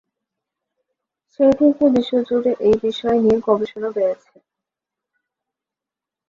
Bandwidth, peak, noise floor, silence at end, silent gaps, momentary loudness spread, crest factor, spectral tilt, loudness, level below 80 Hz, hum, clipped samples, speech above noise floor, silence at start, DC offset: 7.4 kHz; -4 dBFS; -87 dBFS; 2.15 s; none; 7 LU; 16 dB; -7 dB/octave; -18 LUFS; -54 dBFS; none; under 0.1%; 70 dB; 1.4 s; under 0.1%